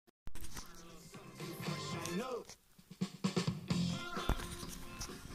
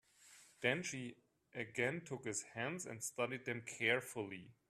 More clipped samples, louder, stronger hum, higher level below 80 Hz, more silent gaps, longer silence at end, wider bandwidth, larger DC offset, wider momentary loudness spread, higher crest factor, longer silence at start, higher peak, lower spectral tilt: neither; about the same, -41 LUFS vs -41 LUFS; neither; first, -52 dBFS vs -82 dBFS; first, 0.10-0.26 s vs none; second, 0 s vs 0.15 s; first, 15.5 kHz vs 14 kHz; neither; first, 17 LU vs 12 LU; about the same, 26 dB vs 24 dB; second, 0.05 s vs 0.2 s; first, -16 dBFS vs -20 dBFS; first, -5 dB/octave vs -3.5 dB/octave